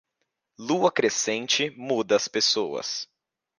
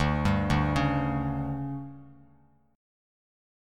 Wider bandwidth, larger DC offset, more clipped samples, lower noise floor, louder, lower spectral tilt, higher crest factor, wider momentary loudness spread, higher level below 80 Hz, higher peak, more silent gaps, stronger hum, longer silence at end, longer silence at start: about the same, 11 kHz vs 11.5 kHz; neither; neither; first, -79 dBFS vs -62 dBFS; first, -24 LUFS vs -28 LUFS; second, -2 dB/octave vs -7 dB/octave; about the same, 20 dB vs 18 dB; about the same, 10 LU vs 12 LU; second, -76 dBFS vs -40 dBFS; first, -8 dBFS vs -12 dBFS; neither; second, none vs 50 Hz at -65 dBFS; second, 0.55 s vs 1 s; first, 0.6 s vs 0 s